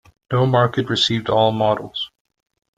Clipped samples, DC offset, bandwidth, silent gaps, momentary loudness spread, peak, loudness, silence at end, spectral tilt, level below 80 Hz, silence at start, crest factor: under 0.1%; under 0.1%; 9.2 kHz; none; 11 LU; -2 dBFS; -19 LUFS; 0.7 s; -5.5 dB/octave; -54 dBFS; 0.3 s; 18 dB